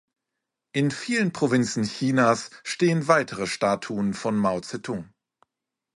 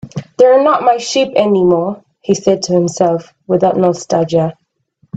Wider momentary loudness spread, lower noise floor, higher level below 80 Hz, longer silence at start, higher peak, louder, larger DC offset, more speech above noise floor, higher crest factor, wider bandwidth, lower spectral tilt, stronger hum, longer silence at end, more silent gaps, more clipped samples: about the same, 11 LU vs 10 LU; first, -85 dBFS vs -57 dBFS; second, -62 dBFS vs -54 dBFS; first, 0.75 s vs 0.05 s; second, -6 dBFS vs 0 dBFS; second, -24 LUFS vs -13 LUFS; neither; first, 61 dB vs 45 dB; first, 20 dB vs 12 dB; first, 11.5 kHz vs 8.4 kHz; about the same, -5.5 dB/octave vs -5.5 dB/octave; neither; first, 0.9 s vs 0 s; neither; neither